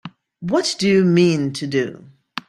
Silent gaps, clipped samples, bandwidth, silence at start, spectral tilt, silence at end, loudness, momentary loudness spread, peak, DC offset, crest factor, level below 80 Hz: none; under 0.1%; 12 kHz; 0.05 s; -5.5 dB/octave; 0.1 s; -18 LUFS; 14 LU; -4 dBFS; under 0.1%; 16 dB; -58 dBFS